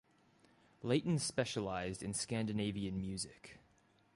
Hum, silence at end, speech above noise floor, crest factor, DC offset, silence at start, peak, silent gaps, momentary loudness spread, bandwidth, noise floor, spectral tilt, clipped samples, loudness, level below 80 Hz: none; 0.55 s; 33 dB; 20 dB; under 0.1%; 0.8 s; -20 dBFS; none; 11 LU; 11.5 kHz; -71 dBFS; -5 dB/octave; under 0.1%; -39 LUFS; -64 dBFS